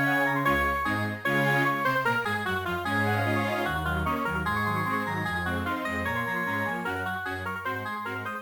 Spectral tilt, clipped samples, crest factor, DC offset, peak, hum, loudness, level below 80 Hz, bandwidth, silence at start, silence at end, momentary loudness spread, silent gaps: -5.5 dB/octave; under 0.1%; 14 dB; under 0.1%; -14 dBFS; none; -27 LUFS; -46 dBFS; 18 kHz; 0 s; 0 s; 8 LU; none